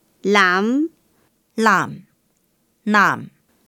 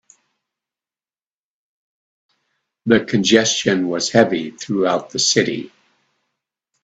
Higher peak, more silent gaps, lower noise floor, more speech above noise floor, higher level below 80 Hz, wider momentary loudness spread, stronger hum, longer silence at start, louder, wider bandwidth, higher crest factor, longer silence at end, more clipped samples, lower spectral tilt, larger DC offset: about the same, -2 dBFS vs 0 dBFS; neither; second, -65 dBFS vs under -90 dBFS; second, 48 dB vs over 73 dB; second, -70 dBFS vs -60 dBFS; first, 14 LU vs 10 LU; neither; second, 0.25 s vs 2.85 s; about the same, -17 LUFS vs -17 LUFS; first, 17.5 kHz vs 9.2 kHz; about the same, 18 dB vs 20 dB; second, 0.4 s vs 1.15 s; neither; about the same, -4.5 dB/octave vs -3.5 dB/octave; neither